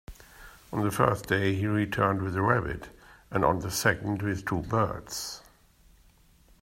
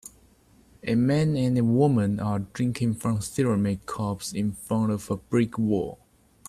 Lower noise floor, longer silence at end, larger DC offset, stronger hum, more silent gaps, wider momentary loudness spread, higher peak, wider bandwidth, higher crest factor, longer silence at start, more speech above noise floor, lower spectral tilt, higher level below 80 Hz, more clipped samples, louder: about the same, -60 dBFS vs -58 dBFS; first, 1.2 s vs 0.55 s; neither; neither; neither; first, 11 LU vs 8 LU; about the same, -8 dBFS vs -10 dBFS; first, 16 kHz vs 14.5 kHz; first, 22 dB vs 16 dB; about the same, 0.1 s vs 0.05 s; about the same, 32 dB vs 33 dB; second, -5.5 dB/octave vs -7 dB/octave; about the same, -52 dBFS vs -54 dBFS; neither; about the same, -28 LUFS vs -26 LUFS